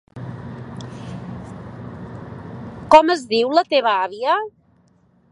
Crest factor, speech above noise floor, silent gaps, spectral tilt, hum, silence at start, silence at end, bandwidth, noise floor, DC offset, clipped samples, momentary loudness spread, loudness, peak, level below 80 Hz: 20 dB; 41 dB; none; -5.5 dB/octave; none; 0.15 s; 0.8 s; 11 kHz; -57 dBFS; under 0.1%; under 0.1%; 22 LU; -17 LUFS; 0 dBFS; -52 dBFS